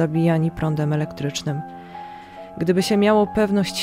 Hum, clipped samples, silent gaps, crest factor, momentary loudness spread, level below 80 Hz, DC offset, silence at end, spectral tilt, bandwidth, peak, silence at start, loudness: none; under 0.1%; none; 16 dB; 19 LU; -50 dBFS; under 0.1%; 0 s; -6 dB/octave; 16 kHz; -4 dBFS; 0 s; -21 LUFS